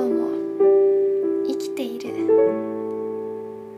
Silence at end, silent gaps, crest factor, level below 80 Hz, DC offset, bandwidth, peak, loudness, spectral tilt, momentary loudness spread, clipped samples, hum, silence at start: 0 s; none; 14 dB; -74 dBFS; under 0.1%; 13 kHz; -8 dBFS; -21 LUFS; -6.5 dB/octave; 12 LU; under 0.1%; none; 0 s